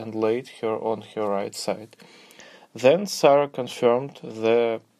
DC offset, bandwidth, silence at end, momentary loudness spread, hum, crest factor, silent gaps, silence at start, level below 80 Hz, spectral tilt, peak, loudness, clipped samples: under 0.1%; 15 kHz; 0.2 s; 11 LU; none; 20 dB; none; 0 s; -76 dBFS; -5 dB/octave; -4 dBFS; -23 LUFS; under 0.1%